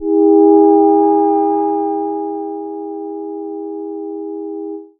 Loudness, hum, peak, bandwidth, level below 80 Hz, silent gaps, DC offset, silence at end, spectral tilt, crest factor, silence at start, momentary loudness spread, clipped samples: -13 LUFS; none; 0 dBFS; 1.7 kHz; -60 dBFS; none; under 0.1%; 0.15 s; -10.5 dB/octave; 14 dB; 0 s; 16 LU; under 0.1%